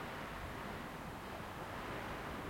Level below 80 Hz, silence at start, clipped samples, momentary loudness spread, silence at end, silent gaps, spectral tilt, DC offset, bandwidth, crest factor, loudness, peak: -58 dBFS; 0 s; under 0.1%; 3 LU; 0 s; none; -5 dB/octave; under 0.1%; 16.5 kHz; 12 dB; -46 LUFS; -32 dBFS